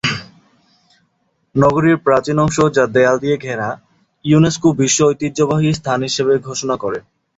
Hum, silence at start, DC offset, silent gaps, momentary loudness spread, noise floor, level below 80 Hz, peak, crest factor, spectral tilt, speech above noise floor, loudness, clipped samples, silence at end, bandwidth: none; 0.05 s; under 0.1%; none; 10 LU; -65 dBFS; -48 dBFS; -2 dBFS; 14 dB; -5 dB/octave; 50 dB; -15 LUFS; under 0.1%; 0.35 s; 8 kHz